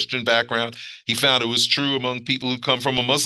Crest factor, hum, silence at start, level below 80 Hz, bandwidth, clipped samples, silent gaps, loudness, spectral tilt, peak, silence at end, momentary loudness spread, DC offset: 20 dB; none; 0 s; -60 dBFS; 12.5 kHz; under 0.1%; none; -20 LUFS; -3 dB/octave; -2 dBFS; 0 s; 7 LU; under 0.1%